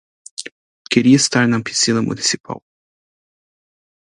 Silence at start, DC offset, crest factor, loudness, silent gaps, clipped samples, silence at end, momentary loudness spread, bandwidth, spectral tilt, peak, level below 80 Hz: 0.4 s; under 0.1%; 20 dB; -16 LUFS; 0.52-0.85 s, 2.40-2.44 s; under 0.1%; 1.55 s; 20 LU; 11.5 kHz; -3.5 dB/octave; 0 dBFS; -58 dBFS